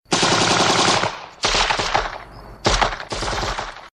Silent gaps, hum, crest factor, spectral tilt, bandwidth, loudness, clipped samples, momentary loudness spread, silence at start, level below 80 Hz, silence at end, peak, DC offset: none; none; 20 dB; -2.5 dB/octave; 13 kHz; -19 LUFS; under 0.1%; 11 LU; 0.1 s; -34 dBFS; 0.05 s; -2 dBFS; under 0.1%